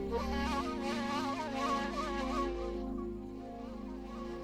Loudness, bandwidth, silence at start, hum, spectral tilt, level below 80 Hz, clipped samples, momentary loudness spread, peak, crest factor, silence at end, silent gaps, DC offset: -37 LUFS; 15.5 kHz; 0 s; none; -5 dB/octave; -48 dBFS; under 0.1%; 10 LU; -22 dBFS; 14 dB; 0 s; none; under 0.1%